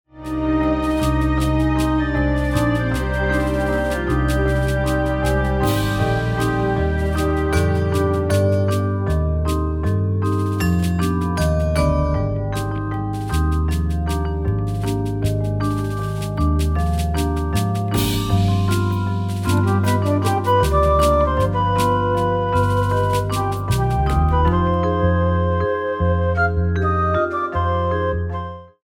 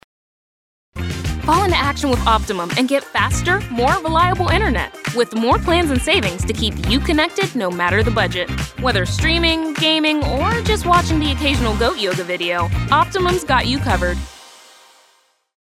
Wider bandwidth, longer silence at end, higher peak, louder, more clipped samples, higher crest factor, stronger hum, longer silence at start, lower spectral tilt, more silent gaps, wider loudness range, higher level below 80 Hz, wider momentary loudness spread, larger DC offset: about the same, 16.5 kHz vs 16 kHz; second, 0.15 s vs 1.1 s; about the same, -4 dBFS vs -2 dBFS; second, -20 LUFS vs -17 LUFS; neither; about the same, 14 dB vs 16 dB; neither; second, 0.15 s vs 0.95 s; first, -7 dB/octave vs -4.5 dB/octave; neither; about the same, 4 LU vs 2 LU; about the same, -26 dBFS vs -28 dBFS; about the same, 5 LU vs 6 LU; neither